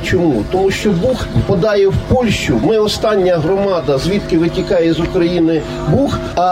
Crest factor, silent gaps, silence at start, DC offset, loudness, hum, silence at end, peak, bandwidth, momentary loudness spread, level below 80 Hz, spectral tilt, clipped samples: 12 dB; none; 0 s; under 0.1%; -14 LUFS; none; 0 s; -2 dBFS; 15.5 kHz; 3 LU; -30 dBFS; -6.5 dB/octave; under 0.1%